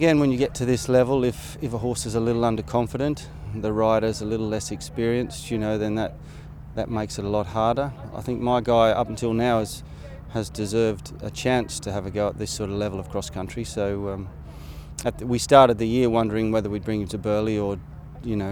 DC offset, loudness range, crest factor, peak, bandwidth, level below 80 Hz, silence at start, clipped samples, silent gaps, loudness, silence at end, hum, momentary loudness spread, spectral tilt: under 0.1%; 6 LU; 24 dB; 0 dBFS; 18.5 kHz; -42 dBFS; 0 s; under 0.1%; none; -24 LUFS; 0 s; none; 14 LU; -6 dB/octave